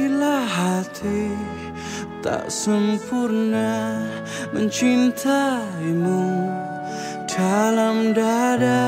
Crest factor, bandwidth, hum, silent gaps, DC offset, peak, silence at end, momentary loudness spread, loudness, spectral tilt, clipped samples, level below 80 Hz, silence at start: 14 dB; 16 kHz; none; none; under 0.1%; -8 dBFS; 0 s; 10 LU; -22 LUFS; -5 dB/octave; under 0.1%; -54 dBFS; 0 s